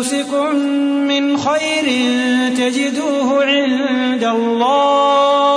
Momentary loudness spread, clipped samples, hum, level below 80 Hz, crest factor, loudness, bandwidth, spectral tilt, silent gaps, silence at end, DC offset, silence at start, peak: 5 LU; under 0.1%; none; -66 dBFS; 12 dB; -15 LUFS; 11 kHz; -3 dB/octave; none; 0 s; under 0.1%; 0 s; -2 dBFS